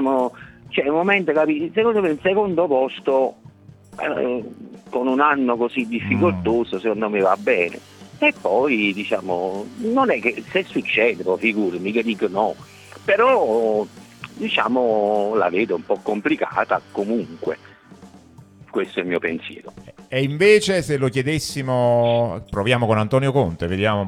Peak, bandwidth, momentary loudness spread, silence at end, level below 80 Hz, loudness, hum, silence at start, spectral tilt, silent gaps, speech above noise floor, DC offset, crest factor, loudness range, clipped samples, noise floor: -2 dBFS; 14 kHz; 10 LU; 0 s; -54 dBFS; -20 LUFS; none; 0 s; -6 dB/octave; none; 26 dB; under 0.1%; 18 dB; 4 LU; under 0.1%; -46 dBFS